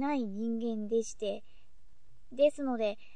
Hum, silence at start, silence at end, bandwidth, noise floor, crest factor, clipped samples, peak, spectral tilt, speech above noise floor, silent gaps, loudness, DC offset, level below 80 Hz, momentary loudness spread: none; 0 s; 0.2 s; 9.8 kHz; -64 dBFS; 18 dB; under 0.1%; -16 dBFS; -5 dB/octave; 32 dB; none; -33 LUFS; 0.7%; -66 dBFS; 9 LU